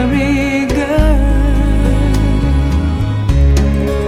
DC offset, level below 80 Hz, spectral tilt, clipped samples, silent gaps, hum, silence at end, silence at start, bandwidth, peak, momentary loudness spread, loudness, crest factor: under 0.1%; -14 dBFS; -7 dB/octave; under 0.1%; none; none; 0 s; 0 s; 12.5 kHz; 0 dBFS; 3 LU; -14 LUFS; 12 dB